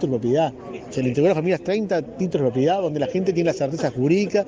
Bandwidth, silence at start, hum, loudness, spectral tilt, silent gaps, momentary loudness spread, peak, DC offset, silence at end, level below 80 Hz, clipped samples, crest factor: 9.2 kHz; 0 s; none; -22 LUFS; -7 dB/octave; none; 6 LU; -6 dBFS; under 0.1%; 0 s; -56 dBFS; under 0.1%; 14 dB